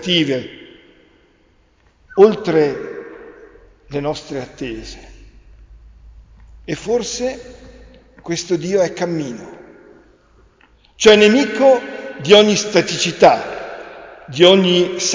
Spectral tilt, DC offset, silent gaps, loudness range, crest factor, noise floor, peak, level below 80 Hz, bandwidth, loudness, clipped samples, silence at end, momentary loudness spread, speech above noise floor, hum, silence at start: -4 dB/octave; under 0.1%; none; 15 LU; 18 dB; -55 dBFS; 0 dBFS; -48 dBFS; 7.6 kHz; -15 LUFS; under 0.1%; 0 s; 22 LU; 40 dB; none; 0 s